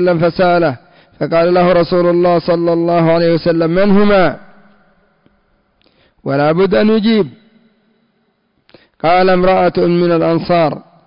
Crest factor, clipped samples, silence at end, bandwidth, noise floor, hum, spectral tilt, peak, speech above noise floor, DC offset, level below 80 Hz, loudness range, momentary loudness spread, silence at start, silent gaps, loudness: 8 dB; under 0.1%; 0.25 s; 5.4 kHz; -61 dBFS; none; -11 dB/octave; -4 dBFS; 50 dB; under 0.1%; -44 dBFS; 5 LU; 7 LU; 0 s; none; -12 LUFS